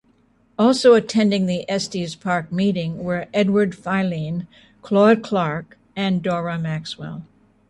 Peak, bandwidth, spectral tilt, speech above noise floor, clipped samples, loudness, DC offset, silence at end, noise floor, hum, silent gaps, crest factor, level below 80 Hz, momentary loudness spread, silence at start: -4 dBFS; 11.5 kHz; -6 dB/octave; 39 dB; under 0.1%; -20 LUFS; under 0.1%; 0.45 s; -59 dBFS; none; none; 18 dB; -58 dBFS; 16 LU; 0.6 s